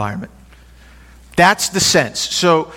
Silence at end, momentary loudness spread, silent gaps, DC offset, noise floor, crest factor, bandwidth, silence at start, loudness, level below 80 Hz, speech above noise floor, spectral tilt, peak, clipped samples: 0 s; 14 LU; none; under 0.1%; -43 dBFS; 18 dB; 17 kHz; 0 s; -14 LUFS; -46 dBFS; 28 dB; -3 dB/octave; 0 dBFS; under 0.1%